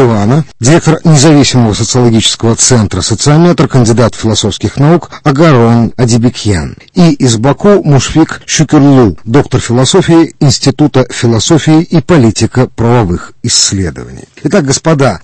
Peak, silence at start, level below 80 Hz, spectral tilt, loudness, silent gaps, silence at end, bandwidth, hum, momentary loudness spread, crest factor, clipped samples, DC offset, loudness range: 0 dBFS; 0 s; -32 dBFS; -5 dB/octave; -7 LUFS; none; 0.05 s; 11 kHz; none; 5 LU; 6 dB; 3%; under 0.1%; 2 LU